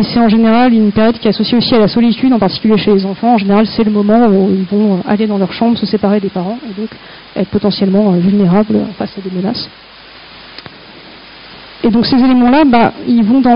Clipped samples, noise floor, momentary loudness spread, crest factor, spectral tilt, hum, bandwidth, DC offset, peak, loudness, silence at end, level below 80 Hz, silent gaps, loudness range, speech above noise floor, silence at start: under 0.1%; -35 dBFS; 13 LU; 12 dB; -5.5 dB/octave; none; 5.4 kHz; under 0.1%; 0 dBFS; -11 LUFS; 0 s; -40 dBFS; none; 6 LU; 25 dB; 0 s